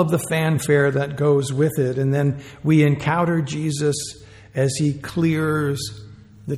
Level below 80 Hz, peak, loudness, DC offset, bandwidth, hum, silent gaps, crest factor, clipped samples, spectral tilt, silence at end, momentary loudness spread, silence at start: -52 dBFS; -4 dBFS; -20 LUFS; under 0.1%; 15 kHz; none; none; 16 dB; under 0.1%; -6 dB/octave; 0 s; 10 LU; 0 s